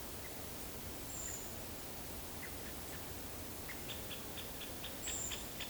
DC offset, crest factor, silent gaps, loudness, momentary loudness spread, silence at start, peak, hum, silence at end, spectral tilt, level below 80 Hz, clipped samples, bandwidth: under 0.1%; 18 dB; none; -43 LUFS; 4 LU; 0 s; -28 dBFS; none; 0 s; -2.5 dB/octave; -58 dBFS; under 0.1%; over 20 kHz